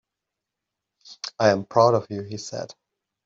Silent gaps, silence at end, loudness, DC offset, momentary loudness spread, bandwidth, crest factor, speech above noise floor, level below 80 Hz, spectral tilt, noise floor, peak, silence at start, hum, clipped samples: none; 0.55 s; -22 LUFS; under 0.1%; 17 LU; 7.8 kHz; 22 dB; 63 dB; -68 dBFS; -5 dB/octave; -85 dBFS; -4 dBFS; 1.05 s; none; under 0.1%